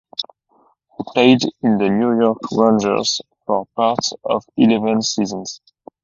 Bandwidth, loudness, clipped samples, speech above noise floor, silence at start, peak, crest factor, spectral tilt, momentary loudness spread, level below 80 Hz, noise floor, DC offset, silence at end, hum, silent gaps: 7.6 kHz; -17 LUFS; under 0.1%; 42 dB; 0.2 s; 0 dBFS; 18 dB; -4.5 dB/octave; 14 LU; -58 dBFS; -58 dBFS; under 0.1%; 0.5 s; none; none